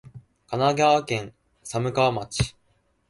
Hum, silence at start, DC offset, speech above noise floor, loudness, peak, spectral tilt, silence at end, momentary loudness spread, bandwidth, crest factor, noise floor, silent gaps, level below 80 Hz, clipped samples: none; 0.05 s; under 0.1%; 44 dB; -24 LUFS; -8 dBFS; -5 dB/octave; 0.6 s; 12 LU; 11.5 kHz; 18 dB; -67 dBFS; none; -48 dBFS; under 0.1%